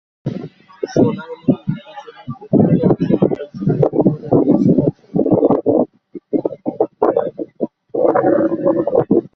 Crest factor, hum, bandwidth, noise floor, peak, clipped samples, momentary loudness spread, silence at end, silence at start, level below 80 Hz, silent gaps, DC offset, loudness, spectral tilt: 16 dB; none; 6.4 kHz; -36 dBFS; 0 dBFS; under 0.1%; 13 LU; 0.1 s; 0.25 s; -48 dBFS; none; under 0.1%; -16 LUFS; -10 dB/octave